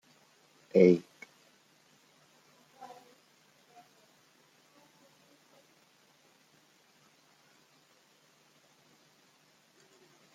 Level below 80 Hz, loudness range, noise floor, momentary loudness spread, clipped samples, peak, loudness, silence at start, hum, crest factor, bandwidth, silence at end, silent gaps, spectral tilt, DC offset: -82 dBFS; 27 LU; -66 dBFS; 30 LU; under 0.1%; -8 dBFS; -26 LUFS; 0.75 s; none; 28 dB; 13.5 kHz; 9.35 s; none; -8 dB/octave; under 0.1%